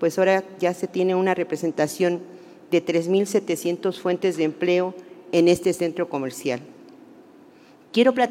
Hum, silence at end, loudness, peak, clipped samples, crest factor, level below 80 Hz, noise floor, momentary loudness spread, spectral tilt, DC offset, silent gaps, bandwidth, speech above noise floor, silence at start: none; 0 s; -23 LUFS; -4 dBFS; under 0.1%; 18 dB; -68 dBFS; -50 dBFS; 8 LU; -5.5 dB/octave; under 0.1%; none; 16 kHz; 29 dB; 0 s